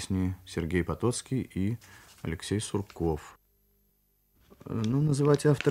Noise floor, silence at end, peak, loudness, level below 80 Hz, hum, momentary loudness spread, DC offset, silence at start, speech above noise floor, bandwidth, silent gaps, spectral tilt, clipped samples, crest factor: -70 dBFS; 0 s; -10 dBFS; -30 LUFS; -50 dBFS; 50 Hz at -55 dBFS; 13 LU; under 0.1%; 0 s; 41 dB; 15.5 kHz; none; -6.5 dB/octave; under 0.1%; 20 dB